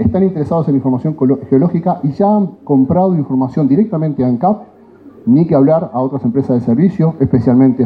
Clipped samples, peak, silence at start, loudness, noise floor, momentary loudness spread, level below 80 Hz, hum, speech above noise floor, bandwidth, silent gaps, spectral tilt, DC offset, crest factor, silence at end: under 0.1%; -2 dBFS; 0 s; -13 LUFS; -39 dBFS; 5 LU; -44 dBFS; none; 27 dB; 4.8 kHz; none; -12 dB/octave; under 0.1%; 12 dB; 0 s